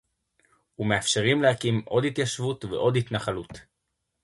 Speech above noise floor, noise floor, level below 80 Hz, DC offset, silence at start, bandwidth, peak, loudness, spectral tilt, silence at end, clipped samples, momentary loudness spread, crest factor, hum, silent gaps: 54 dB; -79 dBFS; -56 dBFS; under 0.1%; 0.8 s; 11.5 kHz; -8 dBFS; -25 LUFS; -4.5 dB/octave; 0.6 s; under 0.1%; 10 LU; 20 dB; none; none